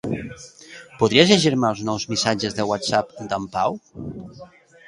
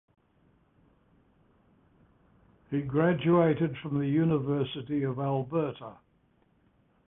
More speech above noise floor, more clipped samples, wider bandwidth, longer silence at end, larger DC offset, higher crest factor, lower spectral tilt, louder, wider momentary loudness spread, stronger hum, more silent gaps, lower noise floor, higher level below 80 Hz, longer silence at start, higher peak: second, 23 dB vs 40 dB; neither; first, 11.5 kHz vs 3.8 kHz; second, 0.4 s vs 1.15 s; neither; about the same, 22 dB vs 20 dB; second, -4.5 dB/octave vs -11.5 dB/octave; first, -20 LUFS vs -29 LUFS; first, 24 LU vs 11 LU; neither; neither; second, -43 dBFS vs -68 dBFS; first, -54 dBFS vs -64 dBFS; second, 0.05 s vs 2.7 s; first, 0 dBFS vs -12 dBFS